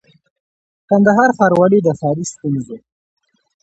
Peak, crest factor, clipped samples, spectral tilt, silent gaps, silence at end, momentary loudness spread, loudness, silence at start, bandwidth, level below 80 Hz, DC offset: 0 dBFS; 16 dB; under 0.1%; -7 dB/octave; none; 0.85 s; 12 LU; -14 LUFS; 0.9 s; 8.2 kHz; -58 dBFS; under 0.1%